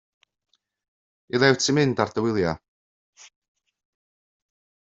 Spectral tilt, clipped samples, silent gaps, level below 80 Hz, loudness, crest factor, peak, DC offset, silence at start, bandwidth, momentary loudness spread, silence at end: -4.5 dB/octave; under 0.1%; none; -62 dBFS; -22 LUFS; 24 dB; -4 dBFS; under 0.1%; 1.35 s; 7.8 kHz; 10 LU; 2.3 s